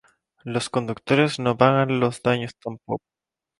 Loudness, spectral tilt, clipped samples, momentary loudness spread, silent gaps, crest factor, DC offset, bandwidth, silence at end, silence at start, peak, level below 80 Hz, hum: -23 LUFS; -6 dB/octave; under 0.1%; 14 LU; none; 22 dB; under 0.1%; 11.5 kHz; 0.65 s; 0.45 s; 0 dBFS; -60 dBFS; none